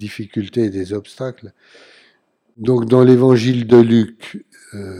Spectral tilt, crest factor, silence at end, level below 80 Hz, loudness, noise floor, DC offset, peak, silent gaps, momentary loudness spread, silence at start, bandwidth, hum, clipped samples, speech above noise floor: -8 dB/octave; 16 dB; 0 s; -62 dBFS; -14 LUFS; -60 dBFS; under 0.1%; 0 dBFS; none; 23 LU; 0 s; 11 kHz; none; under 0.1%; 45 dB